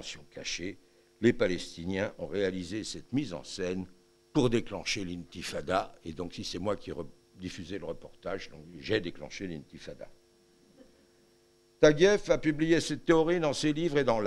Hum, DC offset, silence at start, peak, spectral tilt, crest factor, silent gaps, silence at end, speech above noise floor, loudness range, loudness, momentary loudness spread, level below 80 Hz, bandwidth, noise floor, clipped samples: none; under 0.1%; 0 s; -8 dBFS; -5 dB/octave; 22 dB; none; 0 s; 34 dB; 11 LU; -31 LUFS; 17 LU; -52 dBFS; 12.5 kHz; -65 dBFS; under 0.1%